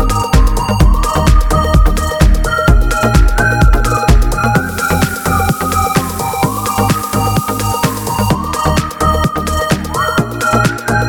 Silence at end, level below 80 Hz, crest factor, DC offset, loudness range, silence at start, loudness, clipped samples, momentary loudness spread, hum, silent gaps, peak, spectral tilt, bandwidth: 0 s; -14 dBFS; 12 dB; under 0.1%; 3 LU; 0 s; -13 LUFS; under 0.1%; 4 LU; none; none; 0 dBFS; -5 dB/octave; over 20 kHz